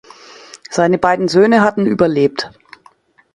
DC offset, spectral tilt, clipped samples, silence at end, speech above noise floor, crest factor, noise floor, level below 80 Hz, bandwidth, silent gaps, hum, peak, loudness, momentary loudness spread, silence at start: under 0.1%; -6 dB/octave; under 0.1%; 0.85 s; 37 dB; 16 dB; -50 dBFS; -52 dBFS; 11.5 kHz; none; none; 0 dBFS; -14 LUFS; 14 LU; 0.55 s